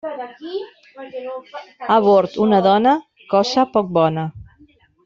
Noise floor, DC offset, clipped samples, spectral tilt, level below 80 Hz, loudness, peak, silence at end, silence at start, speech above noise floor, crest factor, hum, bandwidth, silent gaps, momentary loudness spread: -53 dBFS; under 0.1%; under 0.1%; -6.5 dB/octave; -58 dBFS; -17 LUFS; -2 dBFS; 0.6 s; 0.05 s; 35 dB; 16 dB; none; 7.6 kHz; none; 19 LU